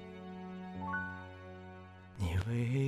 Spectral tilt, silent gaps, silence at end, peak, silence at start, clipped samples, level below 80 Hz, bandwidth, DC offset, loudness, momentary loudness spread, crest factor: -7 dB/octave; none; 0 s; -24 dBFS; 0 s; under 0.1%; -60 dBFS; 13 kHz; under 0.1%; -40 LUFS; 17 LU; 14 dB